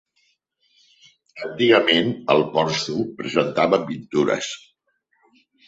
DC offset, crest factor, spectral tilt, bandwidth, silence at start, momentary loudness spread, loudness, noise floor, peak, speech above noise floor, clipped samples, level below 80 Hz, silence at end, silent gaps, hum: under 0.1%; 20 dB; -4.5 dB/octave; 8 kHz; 1.35 s; 13 LU; -20 LUFS; -69 dBFS; -2 dBFS; 49 dB; under 0.1%; -62 dBFS; 1.1 s; none; none